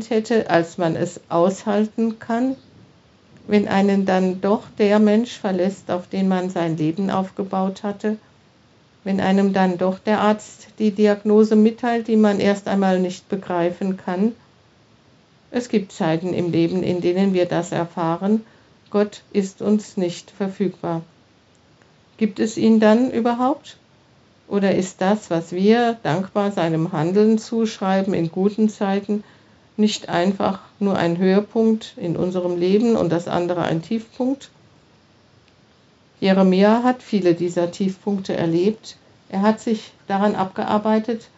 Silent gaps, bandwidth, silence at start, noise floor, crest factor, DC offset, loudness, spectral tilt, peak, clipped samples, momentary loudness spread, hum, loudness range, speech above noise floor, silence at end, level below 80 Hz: none; 8 kHz; 0 s; -55 dBFS; 18 dB; under 0.1%; -20 LUFS; -6 dB/octave; -2 dBFS; under 0.1%; 9 LU; none; 5 LU; 35 dB; 0.15 s; -64 dBFS